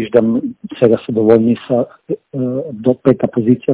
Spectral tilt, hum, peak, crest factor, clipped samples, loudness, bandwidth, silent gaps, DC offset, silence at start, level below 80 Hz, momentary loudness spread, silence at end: -12.5 dB/octave; none; 0 dBFS; 14 dB; 0.6%; -15 LUFS; 4 kHz; none; under 0.1%; 0 s; -52 dBFS; 10 LU; 0 s